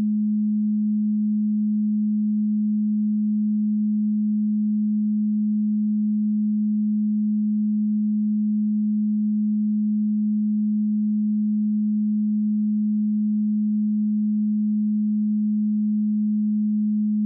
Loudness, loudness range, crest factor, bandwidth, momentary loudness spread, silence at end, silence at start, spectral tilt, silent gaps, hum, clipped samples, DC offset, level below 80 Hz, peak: -22 LUFS; 0 LU; 4 dB; 0.3 kHz; 0 LU; 0 s; 0 s; -26 dB/octave; none; none; under 0.1%; under 0.1%; -90 dBFS; -18 dBFS